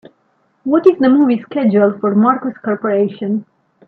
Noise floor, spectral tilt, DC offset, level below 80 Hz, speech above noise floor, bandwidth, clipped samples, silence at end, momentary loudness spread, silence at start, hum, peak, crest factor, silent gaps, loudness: -60 dBFS; -10 dB/octave; under 0.1%; -64 dBFS; 47 dB; 4.7 kHz; under 0.1%; 0.45 s; 10 LU; 0.65 s; none; 0 dBFS; 14 dB; none; -14 LUFS